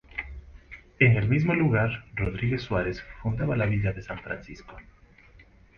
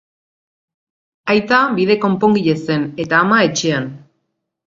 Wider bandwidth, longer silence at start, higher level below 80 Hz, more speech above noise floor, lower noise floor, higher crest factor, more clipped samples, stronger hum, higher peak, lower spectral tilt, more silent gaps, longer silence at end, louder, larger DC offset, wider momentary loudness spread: second, 6.6 kHz vs 7.6 kHz; second, 0.15 s vs 1.25 s; first, -44 dBFS vs -56 dBFS; second, 28 dB vs 57 dB; second, -54 dBFS vs -72 dBFS; about the same, 22 dB vs 18 dB; neither; neither; second, -6 dBFS vs 0 dBFS; first, -8.5 dB/octave vs -5 dB/octave; neither; first, 0.95 s vs 0.7 s; second, -26 LUFS vs -15 LUFS; neither; first, 23 LU vs 7 LU